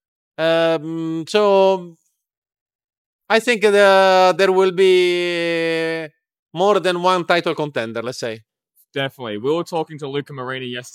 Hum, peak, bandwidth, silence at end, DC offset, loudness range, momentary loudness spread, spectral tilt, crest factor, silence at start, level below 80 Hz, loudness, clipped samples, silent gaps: none; 0 dBFS; 15 kHz; 0.05 s; under 0.1%; 7 LU; 14 LU; -4.5 dB/octave; 18 dB; 0.4 s; -76 dBFS; -18 LUFS; under 0.1%; 2.37-2.42 s, 2.61-2.66 s, 2.75-2.79 s, 2.98-3.19 s, 6.39-6.46 s